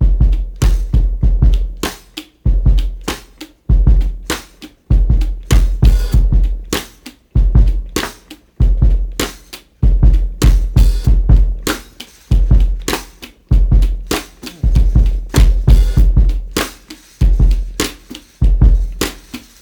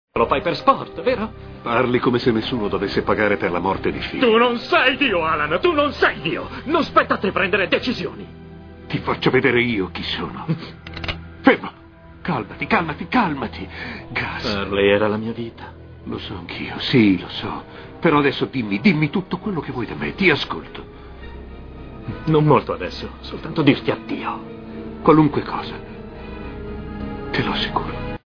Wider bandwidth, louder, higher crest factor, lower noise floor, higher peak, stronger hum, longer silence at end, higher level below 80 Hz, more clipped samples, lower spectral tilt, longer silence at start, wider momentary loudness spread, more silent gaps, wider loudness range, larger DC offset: first, 19 kHz vs 5.4 kHz; first, -16 LUFS vs -20 LUFS; second, 12 dB vs 20 dB; about the same, -39 dBFS vs -42 dBFS; about the same, 0 dBFS vs 0 dBFS; neither; first, 0.25 s vs 0.1 s; first, -12 dBFS vs -42 dBFS; neither; second, -5.5 dB/octave vs -7.5 dB/octave; second, 0 s vs 0.15 s; second, 12 LU vs 18 LU; neither; about the same, 3 LU vs 5 LU; neither